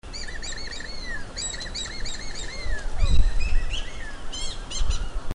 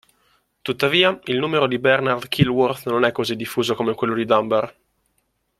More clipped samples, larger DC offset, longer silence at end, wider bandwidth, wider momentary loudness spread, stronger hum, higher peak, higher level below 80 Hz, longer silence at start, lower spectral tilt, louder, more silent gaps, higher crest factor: neither; neither; second, 0 s vs 0.9 s; second, 10.5 kHz vs 15 kHz; about the same, 8 LU vs 6 LU; neither; second, -4 dBFS vs 0 dBFS; first, -26 dBFS vs -56 dBFS; second, 0.05 s vs 0.65 s; second, -3 dB/octave vs -5.5 dB/octave; second, -31 LUFS vs -20 LUFS; neither; about the same, 18 dB vs 20 dB